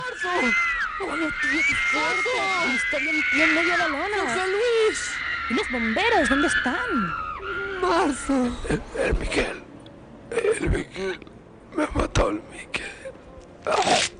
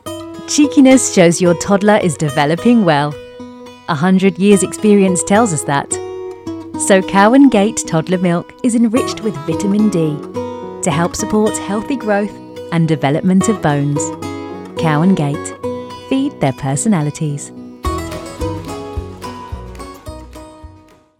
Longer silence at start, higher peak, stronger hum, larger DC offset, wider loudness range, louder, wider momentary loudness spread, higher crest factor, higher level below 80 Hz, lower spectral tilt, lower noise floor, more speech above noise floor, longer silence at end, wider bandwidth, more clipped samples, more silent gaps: about the same, 0 s vs 0.05 s; second, -8 dBFS vs 0 dBFS; neither; neither; about the same, 7 LU vs 8 LU; second, -23 LUFS vs -14 LUFS; second, 11 LU vs 17 LU; about the same, 16 dB vs 14 dB; about the same, -38 dBFS vs -40 dBFS; second, -3.5 dB/octave vs -5.5 dB/octave; about the same, -44 dBFS vs -44 dBFS; second, 21 dB vs 31 dB; second, 0 s vs 0.5 s; second, 10.5 kHz vs 15 kHz; neither; neither